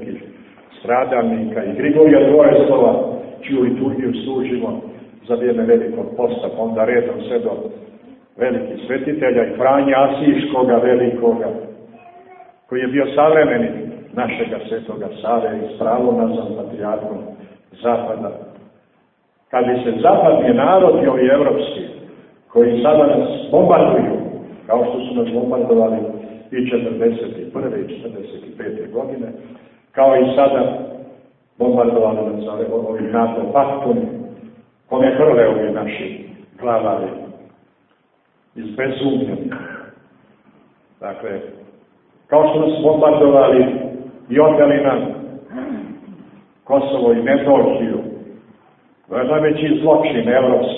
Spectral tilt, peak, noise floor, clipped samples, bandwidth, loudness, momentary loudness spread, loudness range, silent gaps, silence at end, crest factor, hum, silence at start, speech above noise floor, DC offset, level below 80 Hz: -11.5 dB/octave; 0 dBFS; -60 dBFS; under 0.1%; 4 kHz; -16 LUFS; 18 LU; 9 LU; none; 0 s; 16 dB; none; 0 s; 45 dB; under 0.1%; -56 dBFS